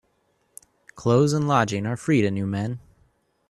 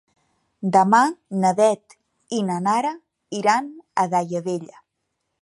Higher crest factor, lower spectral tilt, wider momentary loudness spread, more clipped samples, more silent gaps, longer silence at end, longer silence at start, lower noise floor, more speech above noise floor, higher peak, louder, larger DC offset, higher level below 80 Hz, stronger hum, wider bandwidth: about the same, 18 dB vs 20 dB; about the same, -6.5 dB/octave vs -5.5 dB/octave; second, 10 LU vs 13 LU; neither; neither; about the same, 0.7 s vs 0.8 s; first, 0.95 s vs 0.6 s; second, -68 dBFS vs -77 dBFS; second, 46 dB vs 57 dB; second, -6 dBFS vs -2 dBFS; about the same, -23 LUFS vs -21 LUFS; neither; first, -58 dBFS vs -74 dBFS; neither; about the same, 12.5 kHz vs 11.5 kHz